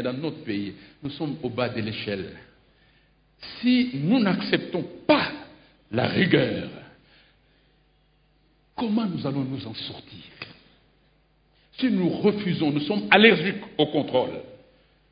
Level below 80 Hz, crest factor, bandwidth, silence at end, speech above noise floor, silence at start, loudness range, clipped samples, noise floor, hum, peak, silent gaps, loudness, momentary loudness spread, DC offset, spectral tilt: -60 dBFS; 26 dB; 5.2 kHz; 0.55 s; 39 dB; 0 s; 10 LU; under 0.1%; -63 dBFS; none; 0 dBFS; none; -24 LUFS; 20 LU; under 0.1%; -10.5 dB/octave